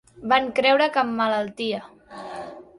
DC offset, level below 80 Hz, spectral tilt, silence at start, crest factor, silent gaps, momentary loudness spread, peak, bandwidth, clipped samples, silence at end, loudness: under 0.1%; -64 dBFS; -4.5 dB/octave; 0.15 s; 20 dB; none; 18 LU; -4 dBFS; 11.5 kHz; under 0.1%; 0.15 s; -22 LUFS